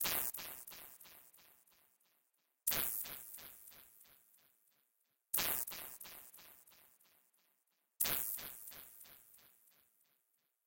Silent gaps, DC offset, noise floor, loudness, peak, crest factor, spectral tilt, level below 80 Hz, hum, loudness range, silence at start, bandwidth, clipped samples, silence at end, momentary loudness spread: none; under 0.1%; -82 dBFS; -39 LUFS; -18 dBFS; 28 dB; 0 dB/octave; -72 dBFS; none; 2 LU; 0 s; 17 kHz; under 0.1%; 1.2 s; 24 LU